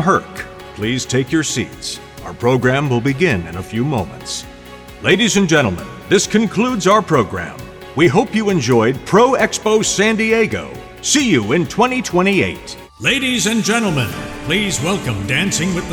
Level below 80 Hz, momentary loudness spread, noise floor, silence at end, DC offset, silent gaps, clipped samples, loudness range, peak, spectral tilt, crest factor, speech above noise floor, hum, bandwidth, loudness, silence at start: -42 dBFS; 13 LU; -36 dBFS; 0 s; under 0.1%; none; under 0.1%; 4 LU; -2 dBFS; -4 dB/octave; 14 dB; 20 dB; none; 20 kHz; -16 LUFS; 0 s